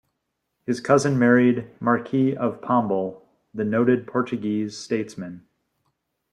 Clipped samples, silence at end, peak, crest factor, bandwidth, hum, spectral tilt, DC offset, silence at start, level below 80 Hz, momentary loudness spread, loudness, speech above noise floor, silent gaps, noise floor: under 0.1%; 0.95 s; -4 dBFS; 20 dB; 10.5 kHz; none; -6.5 dB/octave; under 0.1%; 0.7 s; -64 dBFS; 15 LU; -22 LUFS; 56 dB; none; -78 dBFS